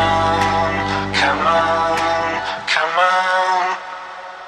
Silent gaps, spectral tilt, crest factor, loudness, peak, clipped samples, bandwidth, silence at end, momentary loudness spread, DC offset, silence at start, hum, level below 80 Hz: none; -4 dB/octave; 16 dB; -17 LUFS; -2 dBFS; under 0.1%; 13 kHz; 0 s; 7 LU; under 0.1%; 0 s; none; -42 dBFS